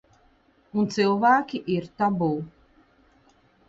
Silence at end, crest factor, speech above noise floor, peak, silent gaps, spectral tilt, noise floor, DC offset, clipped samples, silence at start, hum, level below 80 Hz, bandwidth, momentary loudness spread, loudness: 1.2 s; 18 dB; 38 dB; -8 dBFS; none; -6.5 dB/octave; -61 dBFS; under 0.1%; under 0.1%; 0.75 s; none; -62 dBFS; 7.8 kHz; 12 LU; -24 LUFS